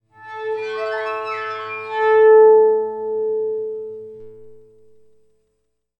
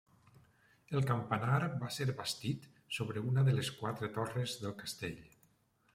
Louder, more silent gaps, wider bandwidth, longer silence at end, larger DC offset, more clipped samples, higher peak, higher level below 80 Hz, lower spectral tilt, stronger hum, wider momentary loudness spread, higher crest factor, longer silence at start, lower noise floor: first, -17 LUFS vs -37 LUFS; neither; second, 5.6 kHz vs 15.5 kHz; first, 1.4 s vs 0.7 s; neither; neither; first, -4 dBFS vs -18 dBFS; about the same, -74 dBFS vs -70 dBFS; about the same, -5 dB/octave vs -5.5 dB/octave; neither; first, 20 LU vs 10 LU; about the same, 16 dB vs 20 dB; second, 0.2 s vs 0.9 s; about the same, -72 dBFS vs -73 dBFS